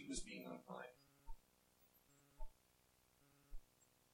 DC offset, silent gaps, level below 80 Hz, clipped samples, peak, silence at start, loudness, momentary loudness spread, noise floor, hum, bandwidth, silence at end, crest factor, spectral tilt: under 0.1%; none; -60 dBFS; under 0.1%; -32 dBFS; 0 s; -55 LUFS; 18 LU; -77 dBFS; none; 16.5 kHz; 0 s; 22 dB; -3.5 dB/octave